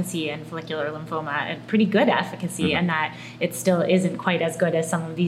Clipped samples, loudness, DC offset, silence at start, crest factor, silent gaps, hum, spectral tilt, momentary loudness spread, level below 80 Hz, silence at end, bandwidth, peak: under 0.1%; -24 LUFS; under 0.1%; 0 s; 18 dB; none; none; -5.5 dB/octave; 9 LU; -64 dBFS; 0 s; 16 kHz; -4 dBFS